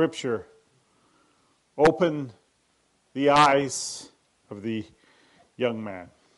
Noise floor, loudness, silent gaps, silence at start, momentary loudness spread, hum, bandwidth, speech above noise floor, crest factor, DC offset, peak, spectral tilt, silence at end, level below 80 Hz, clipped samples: -68 dBFS; -24 LUFS; none; 0 s; 22 LU; none; 11.5 kHz; 44 dB; 20 dB; under 0.1%; -8 dBFS; -4.5 dB/octave; 0.3 s; -60 dBFS; under 0.1%